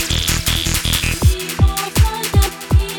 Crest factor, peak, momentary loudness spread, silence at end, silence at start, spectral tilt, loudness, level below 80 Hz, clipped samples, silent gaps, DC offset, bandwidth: 16 dB; 0 dBFS; 1 LU; 0 s; 0 s; -3.5 dB/octave; -16 LUFS; -20 dBFS; under 0.1%; none; under 0.1%; 19.5 kHz